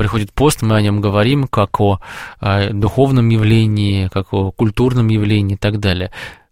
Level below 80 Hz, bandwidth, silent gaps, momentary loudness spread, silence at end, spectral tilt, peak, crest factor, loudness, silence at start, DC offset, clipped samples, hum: -34 dBFS; 15.5 kHz; none; 7 LU; 0.2 s; -6.5 dB/octave; 0 dBFS; 14 dB; -15 LUFS; 0 s; 0.8%; under 0.1%; none